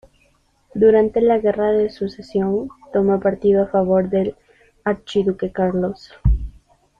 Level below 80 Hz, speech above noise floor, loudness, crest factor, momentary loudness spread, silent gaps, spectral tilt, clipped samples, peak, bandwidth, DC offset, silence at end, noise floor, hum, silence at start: -32 dBFS; 42 dB; -19 LUFS; 16 dB; 10 LU; none; -8.5 dB/octave; under 0.1%; -4 dBFS; 7.2 kHz; under 0.1%; 0.5 s; -60 dBFS; none; 0.75 s